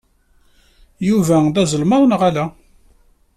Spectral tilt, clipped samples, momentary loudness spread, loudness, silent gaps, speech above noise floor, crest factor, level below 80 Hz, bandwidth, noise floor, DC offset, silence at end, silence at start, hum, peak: -6 dB/octave; under 0.1%; 10 LU; -16 LUFS; none; 41 dB; 14 dB; -48 dBFS; 14 kHz; -55 dBFS; under 0.1%; 0.85 s; 1 s; none; -4 dBFS